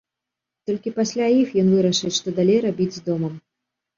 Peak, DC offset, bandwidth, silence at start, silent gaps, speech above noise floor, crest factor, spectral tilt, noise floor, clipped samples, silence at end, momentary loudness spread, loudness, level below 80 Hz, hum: -6 dBFS; under 0.1%; 7.4 kHz; 0.7 s; none; 65 dB; 14 dB; -5.5 dB/octave; -85 dBFS; under 0.1%; 0.6 s; 10 LU; -21 LUFS; -62 dBFS; none